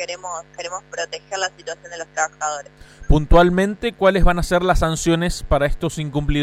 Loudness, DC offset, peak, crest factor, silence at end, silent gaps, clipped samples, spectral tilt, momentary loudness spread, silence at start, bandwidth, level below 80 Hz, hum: -20 LUFS; under 0.1%; -4 dBFS; 16 dB; 0 s; none; under 0.1%; -5 dB/octave; 14 LU; 0 s; 14 kHz; -24 dBFS; 50 Hz at -40 dBFS